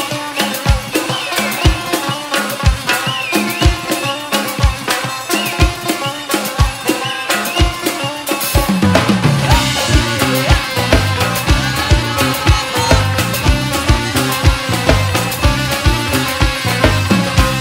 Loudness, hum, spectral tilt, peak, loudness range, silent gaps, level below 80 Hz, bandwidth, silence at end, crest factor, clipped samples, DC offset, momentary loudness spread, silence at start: -14 LUFS; none; -4 dB/octave; 0 dBFS; 3 LU; none; -22 dBFS; 16.5 kHz; 0 s; 14 dB; under 0.1%; under 0.1%; 5 LU; 0 s